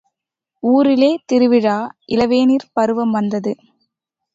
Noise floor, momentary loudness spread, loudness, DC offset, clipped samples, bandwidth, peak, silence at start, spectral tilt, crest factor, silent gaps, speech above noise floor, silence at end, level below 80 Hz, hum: -81 dBFS; 10 LU; -16 LUFS; under 0.1%; under 0.1%; 7.8 kHz; -2 dBFS; 0.65 s; -6.5 dB/octave; 14 dB; none; 66 dB; 0.8 s; -56 dBFS; none